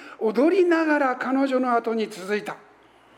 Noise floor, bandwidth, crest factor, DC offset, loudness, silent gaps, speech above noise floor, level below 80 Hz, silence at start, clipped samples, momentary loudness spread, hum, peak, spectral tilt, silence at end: -54 dBFS; 13 kHz; 16 dB; under 0.1%; -22 LUFS; none; 32 dB; -78 dBFS; 0 s; under 0.1%; 9 LU; none; -8 dBFS; -5.5 dB/octave; 0.6 s